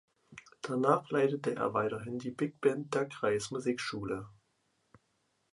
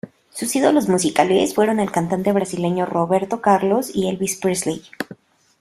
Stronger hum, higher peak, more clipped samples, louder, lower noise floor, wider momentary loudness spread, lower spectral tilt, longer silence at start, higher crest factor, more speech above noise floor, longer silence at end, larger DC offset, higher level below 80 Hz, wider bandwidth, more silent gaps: neither; second, -12 dBFS vs -2 dBFS; neither; second, -33 LUFS vs -19 LUFS; first, -77 dBFS vs -44 dBFS; about the same, 12 LU vs 10 LU; about the same, -5.5 dB/octave vs -5 dB/octave; first, 0.3 s vs 0.05 s; about the same, 22 dB vs 18 dB; first, 44 dB vs 25 dB; first, 1.2 s vs 0.45 s; neither; second, -70 dBFS vs -58 dBFS; second, 11.5 kHz vs 15.5 kHz; neither